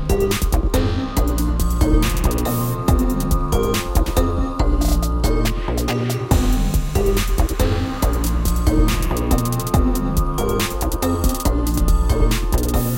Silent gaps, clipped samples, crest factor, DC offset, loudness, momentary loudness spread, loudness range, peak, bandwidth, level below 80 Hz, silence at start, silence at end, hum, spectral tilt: none; under 0.1%; 14 dB; under 0.1%; -20 LUFS; 3 LU; 1 LU; -2 dBFS; 17 kHz; -20 dBFS; 0 s; 0 s; none; -5.5 dB/octave